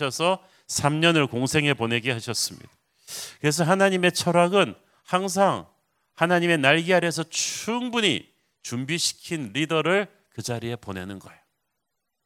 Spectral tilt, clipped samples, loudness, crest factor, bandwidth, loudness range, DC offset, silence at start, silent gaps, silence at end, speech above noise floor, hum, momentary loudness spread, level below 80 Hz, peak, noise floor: -4 dB/octave; under 0.1%; -23 LUFS; 22 dB; 16 kHz; 5 LU; under 0.1%; 0 s; none; 0.95 s; 57 dB; none; 14 LU; -60 dBFS; -2 dBFS; -81 dBFS